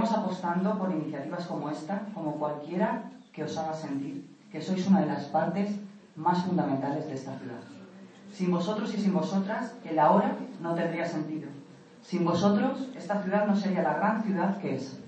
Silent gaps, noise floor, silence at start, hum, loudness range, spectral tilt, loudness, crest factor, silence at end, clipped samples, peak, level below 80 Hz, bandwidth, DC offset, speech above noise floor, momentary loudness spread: none; -50 dBFS; 0 s; none; 5 LU; -7.5 dB/octave; -30 LUFS; 20 dB; 0 s; under 0.1%; -10 dBFS; -78 dBFS; 8.4 kHz; under 0.1%; 21 dB; 14 LU